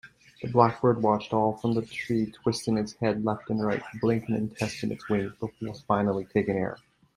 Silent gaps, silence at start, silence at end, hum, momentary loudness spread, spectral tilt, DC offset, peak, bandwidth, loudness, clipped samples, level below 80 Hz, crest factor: none; 0.05 s; 0.4 s; none; 11 LU; -7 dB/octave; under 0.1%; -4 dBFS; 12 kHz; -28 LUFS; under 0.1%; -60 dBFS; 24 dB